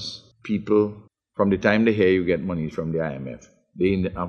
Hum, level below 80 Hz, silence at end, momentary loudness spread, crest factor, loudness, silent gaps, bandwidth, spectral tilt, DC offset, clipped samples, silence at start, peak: none; -52 dBFS; 0 s; 17 LU; 20 dB; -22 LUFS; none; 7.2 kHz; -7.5 dB/octave; under 0.1%; under 0.1%; 0 s; -2 dBFS